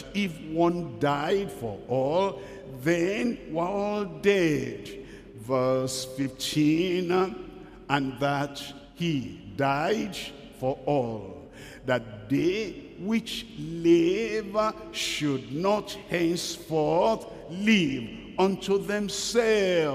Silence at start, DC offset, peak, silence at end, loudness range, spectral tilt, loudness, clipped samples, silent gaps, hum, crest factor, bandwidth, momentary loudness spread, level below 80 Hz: 0 s; under 0.1%; -8 dBFS; 0 s; 4 LU; -5 dB/octave; -27 LUFS; under 0.1%; none; none; 18 dB; 15.5 kHz; 14 LU; -56 dBFS